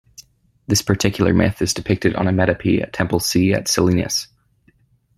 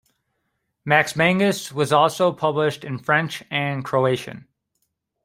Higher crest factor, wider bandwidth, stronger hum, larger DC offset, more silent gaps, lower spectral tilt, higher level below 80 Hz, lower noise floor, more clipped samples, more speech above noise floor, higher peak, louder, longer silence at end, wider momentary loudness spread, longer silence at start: about the same, 18 dB vs 20 dB; about the same, 16 kHz vs 16 kHz; neither; neither; neither; about the same, -4.5 dB/octave vs -5 dB/octave; first, -44 dBFS vs -62 dBFS; second, -58 dBFS vs -74 dBFS; neither; second, 40 dB vs 54 dB; about the same, -2 dBFS vs -2 dBFS; about the same, -18 LUFS vs -20 LUFS; about the same, 0.9 s vs 0.85 s; second, 5 LU vs 8 LU; second, 0.7 s vs 0.85 s